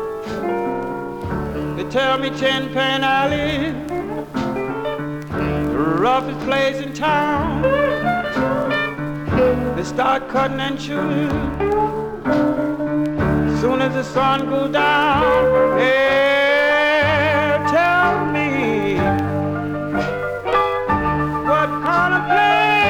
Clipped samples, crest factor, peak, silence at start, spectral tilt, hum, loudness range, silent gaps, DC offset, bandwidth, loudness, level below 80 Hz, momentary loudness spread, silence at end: under 0.1%; 14 dB; -4 dBFS; 0 s; -6 dB/octave; none; 5 LU; none; 0.2%; 18.5 kHz; -18 LUFS; -38 dBFS; 9 LU; 0 s